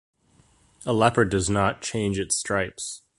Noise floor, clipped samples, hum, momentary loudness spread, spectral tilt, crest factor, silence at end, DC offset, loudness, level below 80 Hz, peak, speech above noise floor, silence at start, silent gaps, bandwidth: -60 dBFS; under 0.1%; none; 10 LU; -4.5 dB/octave; 24 dB; 0.2 s; under 0.1%; -24 LUFS; -46 dBFS; -2 dBFS; 36 dB; 0.8 s; none; 11.5 kHz